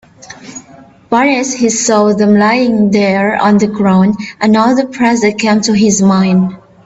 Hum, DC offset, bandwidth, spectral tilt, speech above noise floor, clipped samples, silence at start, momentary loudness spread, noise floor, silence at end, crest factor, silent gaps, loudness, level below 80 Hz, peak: none; under 0.1%; 8 kHz; -5 dB/octave; 29 dB; under 0.1%; 0.3 s; 6 LU; -39 dBFS; 0.3 s; 10 dB; none; -10 LUFS; -50 dBFS; 0 dBFS